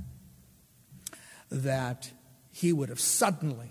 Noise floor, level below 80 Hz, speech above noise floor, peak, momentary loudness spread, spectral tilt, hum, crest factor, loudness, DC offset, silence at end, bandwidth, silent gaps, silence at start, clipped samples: -60 dBFS; -62 dBFS; 30 dB; -12 dBFS; 21 LU; -4 dB/octave; none; 20 dB; -29 LUFS; under 0.1%; 0 s; 16 kHz; none; 0 s; under 0.1%